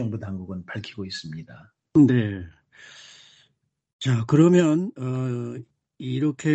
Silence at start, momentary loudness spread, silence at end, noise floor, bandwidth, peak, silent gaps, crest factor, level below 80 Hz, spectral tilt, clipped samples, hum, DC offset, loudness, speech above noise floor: 0 s; 21 LU; 0 s; -69 dBFS; 8.4 kHz; -6 dBFS; 3.93-3.99 s; 18 dB; -60 dBFS; -7.5 dB/octave; under 0.1%; none; under 0.1%; -23 LUFS; 47 dB